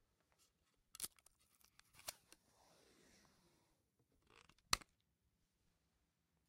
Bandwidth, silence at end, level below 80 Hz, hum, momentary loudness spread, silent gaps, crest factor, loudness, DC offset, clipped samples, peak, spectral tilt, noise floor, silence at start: 16 kHz; 1.7 s; -74 dBFS; none; 25 LU; none; 42 dB; -47 LUFS; under 0.1%; under 0.1%; -14 dBFS; 0 dB/octave; -85 dBFS; 1 s